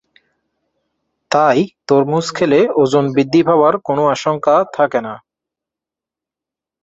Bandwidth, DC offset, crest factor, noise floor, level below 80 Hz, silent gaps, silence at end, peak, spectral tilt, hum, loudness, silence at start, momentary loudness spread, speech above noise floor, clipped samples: 8 kHz; under 0.1%; 16 dB; -87 dBFS; -60 dBFS; none; 1.65 s; 0 dBFS; -6 dB/octave; none; -14 LUFS; 1.3 s; 5 LU; 73 dB; under 0.1%